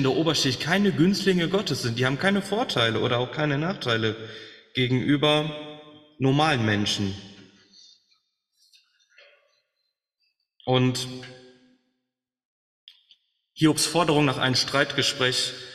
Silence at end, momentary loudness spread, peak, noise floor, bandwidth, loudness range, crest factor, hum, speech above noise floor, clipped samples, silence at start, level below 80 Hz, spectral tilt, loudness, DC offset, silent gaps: 0 s; 12 LU; -6 dBFS; -83 dBFS; 14 kHz; 8 LU; 20 dB; none; 60 dB; under 0.1%; 0 s; -58 dBFS; -4.5 dB/octave; -23 LUFS; under 0.1%; 12.45-12.87 s